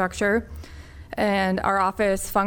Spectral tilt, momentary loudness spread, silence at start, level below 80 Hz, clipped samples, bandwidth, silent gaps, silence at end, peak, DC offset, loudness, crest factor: -5 dB/octave; 19 LU; 0 s; -42 dBFS; under 0.1%; 19 kHz; none; 0 s; -8 dBFS; under 0.1%; -23 LUFS; 16 dB